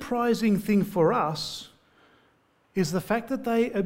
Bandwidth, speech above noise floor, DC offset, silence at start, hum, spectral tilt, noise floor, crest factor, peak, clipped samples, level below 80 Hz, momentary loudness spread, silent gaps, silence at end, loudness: 16 kHz; 40 dB; under 0.1%; 0 s; none; -6 dB/octave; -65 dBFS; 16 dB; -10 dBFS; under 0.1%; -58 dBFS; 10 LU; none; 0 s; -26 LUFS